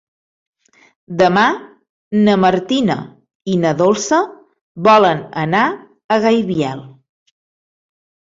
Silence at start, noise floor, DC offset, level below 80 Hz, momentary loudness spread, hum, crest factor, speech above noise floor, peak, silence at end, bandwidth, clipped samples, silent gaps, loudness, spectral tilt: 1.1 s; under -90 dBFS; under 0.1%; -56 dBFS; 15 LU; none; 16 dB; over 76 dB; -2 dBFS; 1.5 s; 7.8 kHz; under 0.1%; 1.89-2.11 s, 3.35-3.40 s, 4.61-4.75 s, 6.04-6.09 s; -15 LUFS; -5.5 dB/octave